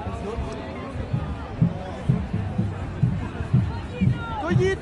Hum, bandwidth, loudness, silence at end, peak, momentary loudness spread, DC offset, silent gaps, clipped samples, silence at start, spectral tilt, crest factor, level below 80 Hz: none; 10.5 kHz; -26 LUFS; 0 s; -8 dBFS; 8 LU; under 0.1%; none; under 0.1%; 0 s; -8 dB/octave; 18 dB; -38 dBFS